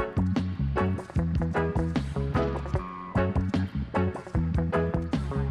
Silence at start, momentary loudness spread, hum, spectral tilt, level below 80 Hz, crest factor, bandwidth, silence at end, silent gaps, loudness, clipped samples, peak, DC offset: 0 s; 3 LU; none; -8.5 dB/octave; -36 dBFS; 14 dB; 10 kHz; 0 s; none; -29 LUFS; under 0.1%; -12 dBFS; under 0.1%